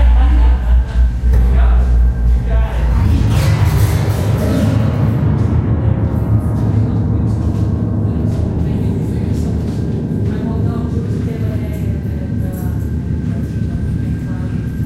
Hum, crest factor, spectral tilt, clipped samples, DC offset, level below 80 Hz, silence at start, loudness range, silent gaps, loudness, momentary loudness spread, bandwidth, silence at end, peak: none; 12 dB; -8 dB/octave; under 0.1%; under 0.1%; -16 dBFS; 0 s; 5 LU; none; -16 LUFS; 6 LU; 15 kHz; 0 s; -2 dBFS